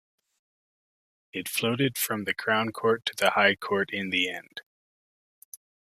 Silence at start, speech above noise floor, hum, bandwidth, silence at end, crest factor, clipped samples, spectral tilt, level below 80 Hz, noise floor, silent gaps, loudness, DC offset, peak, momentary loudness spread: 1.35 s; over 63 dB; none; 15 kHz; 1.35 s; 24 dB; under 0.1%; -3.5 dB/octave; -72 dBFS; under -90 dBFS; none; -26 LUFS; under 0.1%; -6 dBFS; 15 LU